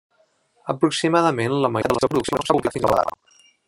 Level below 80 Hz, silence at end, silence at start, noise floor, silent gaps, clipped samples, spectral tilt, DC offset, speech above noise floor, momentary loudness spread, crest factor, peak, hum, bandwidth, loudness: -52 dBFS; 0.55 s; 0.65 s; -63 dBFS; none; under 0.1%; -5.5 dB/octave; under 0.1%; 43 dB; 6 LU; 20 dB; -2 dBFS; none; 16 kHz; -21 LUFS